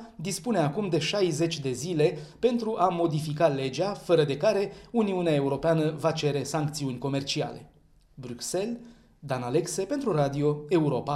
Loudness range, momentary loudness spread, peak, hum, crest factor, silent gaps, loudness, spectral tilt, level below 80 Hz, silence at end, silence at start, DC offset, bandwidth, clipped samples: 6 LU; 8 LU; -8 dBFS; none; 18 dB; none; -27 LUFS; -5.5 dB/octave; -60 dBFS; 0 s; 0 s; under 0.1%; 15 kHz; under 0.1%